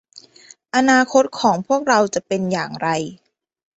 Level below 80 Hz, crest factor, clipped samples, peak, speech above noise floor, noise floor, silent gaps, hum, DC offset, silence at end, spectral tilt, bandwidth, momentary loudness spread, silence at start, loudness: -62 dBFS; 18 dB; under 0.1%; -2 dBFS; 30 dB; -48 dBFS; none; none; under 0.1%; 0.6 s; -4 dB/octave; 8.2 kHz; 8 LU; 0.15 s; -18 LUFS